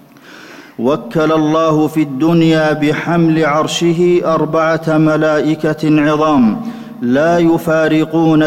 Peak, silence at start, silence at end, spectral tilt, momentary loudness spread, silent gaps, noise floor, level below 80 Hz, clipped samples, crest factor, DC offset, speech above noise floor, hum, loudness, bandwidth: -4 dBFS; 0.3 s; 0 s; -6.5 dB/octave; 5 LU; none; -37 dBFS; -48 dBFS; under 0.1%; 8 dB; under 0.1%; 25 dB; none; -13 LUFS; 14.5 kHz